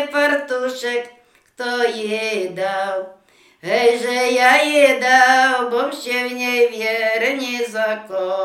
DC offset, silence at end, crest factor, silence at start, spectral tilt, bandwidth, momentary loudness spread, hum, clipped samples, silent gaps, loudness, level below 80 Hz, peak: under 0.1%; 0 s; 18 dB; 0 s; -2 dB/octave; 16.5 kHz; 11 LU; none; under 0.1%; none; -17 LUFS; -76 dBFS; 0 dBFS